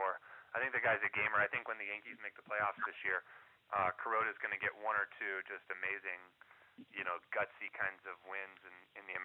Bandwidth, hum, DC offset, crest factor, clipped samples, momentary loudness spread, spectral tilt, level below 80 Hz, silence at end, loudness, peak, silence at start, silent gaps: 4.3 kHz; none; under 0.1%; 20 dB; under 0.1%; 15 LU; -6 dB/octave; -82 dBFS; 0 s; -39 LUFS; -20 dBFS; 0 s; none